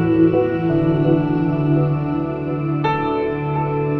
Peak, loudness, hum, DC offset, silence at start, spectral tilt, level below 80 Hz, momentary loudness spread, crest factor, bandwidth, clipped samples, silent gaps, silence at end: -4 dBFS; -19 LUFS; none; under 0.1%; 0 s; -10.5 dB/octave; -44 dBFS; 6 LU; 14 dB; 4.7 kHz; under 0.1%; none; 0 s